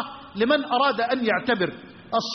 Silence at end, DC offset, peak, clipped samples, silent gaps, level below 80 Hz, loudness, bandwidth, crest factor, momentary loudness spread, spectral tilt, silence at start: 0 s; under 0.1%; -10 dBFS; under 0.1%; none; -64 dBFS; -23 LUFS; 6.4 kHz; 14 dB; 8 LU; -2 dB/octave; 0 s